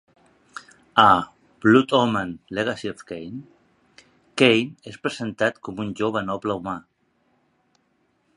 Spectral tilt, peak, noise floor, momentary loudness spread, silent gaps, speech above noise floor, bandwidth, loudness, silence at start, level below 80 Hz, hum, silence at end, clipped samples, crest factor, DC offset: -5.5 dB/octave; 0 dBFS; -67 dBFS; 21 LU; none; 46 dB; 11 kHz; -22 LUFS; 0.55 s; -58 dBFS; none; 1.55 s; under 0.1%; 24 dB; under 0.1%